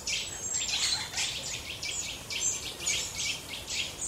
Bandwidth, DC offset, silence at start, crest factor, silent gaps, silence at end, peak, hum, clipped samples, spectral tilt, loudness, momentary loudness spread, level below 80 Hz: 16 kHz; under 0.1%; 0 s; 18 dB; none; 0 s; -14 dBFS; none; under 0.1%; 0.5 dB/octave; -31 LUFS; 7 LU; -54 dBFS